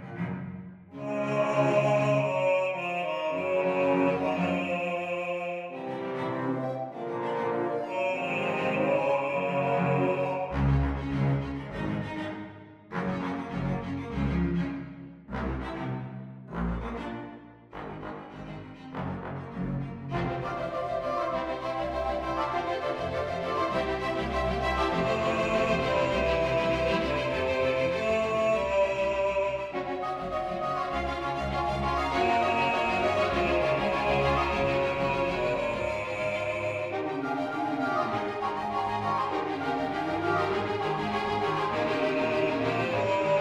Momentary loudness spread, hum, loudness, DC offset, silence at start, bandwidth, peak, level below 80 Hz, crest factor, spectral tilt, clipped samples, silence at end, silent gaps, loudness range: 10 LU; none; -29 LUFS; under 0.1%; 0 s; 12 kHz; -14 dBFS; -44 dBFS; 16 dB; -6.5 dB/octave; under 0.1%; 0 s; none; 7 LU